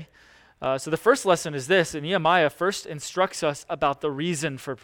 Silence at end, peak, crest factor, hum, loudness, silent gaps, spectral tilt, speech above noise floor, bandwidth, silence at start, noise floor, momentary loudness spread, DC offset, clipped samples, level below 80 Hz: 0.1 s; -6 dBFS; 20 dB; none; -24 LUFS; none; -4 dB/octave; 31 dB; 18.5 kHz; 0 s; -55 dBFS; 8 LU; under 0.1%; under 0.1%; -60 dBFS